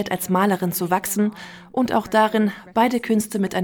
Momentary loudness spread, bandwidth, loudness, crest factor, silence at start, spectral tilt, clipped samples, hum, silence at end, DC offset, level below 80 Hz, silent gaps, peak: 6 LU; over 20 kHz; -21 LUFS; 16 dB; 0 s; -5 dB/octave; under 0.1%; none; 0 s; under 0.1%; -58 dBFS; none; -6 dBFS